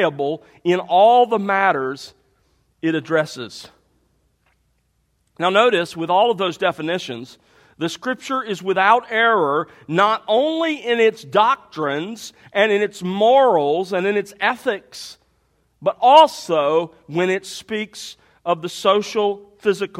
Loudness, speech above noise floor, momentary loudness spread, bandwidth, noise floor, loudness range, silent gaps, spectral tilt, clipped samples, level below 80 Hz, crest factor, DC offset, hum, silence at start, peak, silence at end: -18 LUFS; 47 dB; 14 LU; 15.5 kHz; -66 dBFS; 5 LU; none; -4.5 dB/octave; under 0.1%; -66 dBFS; 20 dB; under 0.1%; none; 0 s; 0 dBFS; 0 s